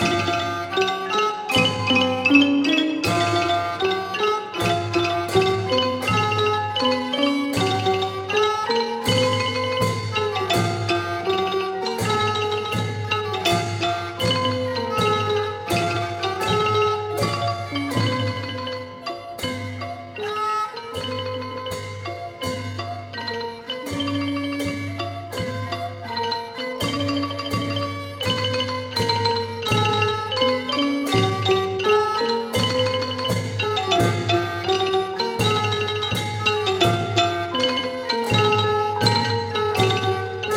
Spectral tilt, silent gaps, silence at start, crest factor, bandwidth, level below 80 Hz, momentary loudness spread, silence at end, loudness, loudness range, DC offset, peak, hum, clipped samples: -4.5 dB/octave; none; 0 s; 20 dB; 16.5 kHz; -52 dBFS; 10 LU; 0 s; -22 LUFS; 8 LU; under 0.1%; -2 dBFS; none; under 0.1%